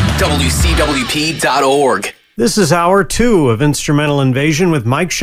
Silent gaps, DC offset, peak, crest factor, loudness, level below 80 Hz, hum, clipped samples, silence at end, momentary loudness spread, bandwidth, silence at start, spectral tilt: none; under 0.1%; 0 dBFS; 12 dB; -13 LUFS; -24 dBFS; none; under 0.1%; 0 s; 4 LU; 16 kHz; 0 s; -4.5 dB/octave